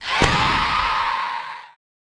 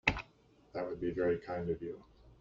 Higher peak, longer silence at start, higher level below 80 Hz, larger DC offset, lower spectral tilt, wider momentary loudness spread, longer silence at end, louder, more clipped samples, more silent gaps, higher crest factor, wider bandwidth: first, 0 dBFS vs -12 dBFS; about the same, 0 s vs 0.05 s; first, -36 dBFS vs -56 dBFS; neither; about the same, -3.5 dB/octave vs -4 dB/octave; about the same, 15 LU vs 13 LU; first, 0.5 s vs 0.05 s; first, -20 LUFS vs -38 LUFS; neither; neither; about the same, 22 dB vs 26 dB; first, 10.5 kHz vs 7.6 kHz